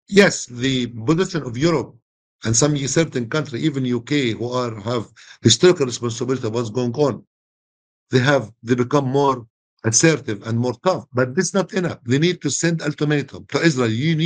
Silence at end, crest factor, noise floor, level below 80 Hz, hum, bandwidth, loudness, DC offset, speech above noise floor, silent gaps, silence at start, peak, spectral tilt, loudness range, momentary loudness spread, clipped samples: 0 s; 20 dB; under -90 dBFS; -54 dBFS; none; 10 kHz; -20 LUFS; under 0.1%; over 71 dB; 2.02-2.39 s, 7.27-8.06 s, 9.50-9.77 s; 0.1 s; 0 dBFS; -4.5 dB/octave; 2 LU; 9 LU; under 0.1%